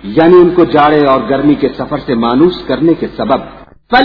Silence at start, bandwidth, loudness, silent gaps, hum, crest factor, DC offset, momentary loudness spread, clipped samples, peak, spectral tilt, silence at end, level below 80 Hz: 0 s; 5.4 kHz; -10 LUFS; none; none; 10 dB; under 0.1%; 9 LU; 0.9%; 0 dBFS; -9 dB/octave; 0 s; -38 dBFS